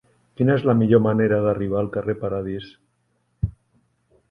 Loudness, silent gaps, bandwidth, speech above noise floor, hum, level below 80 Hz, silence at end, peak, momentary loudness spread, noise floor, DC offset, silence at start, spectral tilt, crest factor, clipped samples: -21 LUFS; none; 5.4 kHz; 49 dB; none; -46 dBFS; 0.8 s; -4 dBFS; 13 LU; -68 dBFS; under 0.1%; 0.4 s; -10.5 dB/octave; 18 dB; under 0.1%